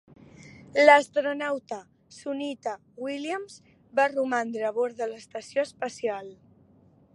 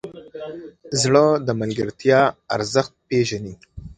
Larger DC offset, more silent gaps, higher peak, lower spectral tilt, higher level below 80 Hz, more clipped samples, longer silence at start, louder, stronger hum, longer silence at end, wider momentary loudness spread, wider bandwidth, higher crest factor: neither; neither; about the same, -4 dBFS vs -2 dBFS; about the same, -3.5 dB/octave vs -4.5 dB/octave; second, -72 dBFS vs -50 dBFS; neither; first, 0.45 s vs 0.05 s; second, -26 LUFS vs -20 LUFS; neither; first, 0.8 s vs 0.05 s; about the same, 19 LU vs 20 LU; first, 11.5 kHz vs 9.6 kHz; about the same, 24 dB vs 20 dB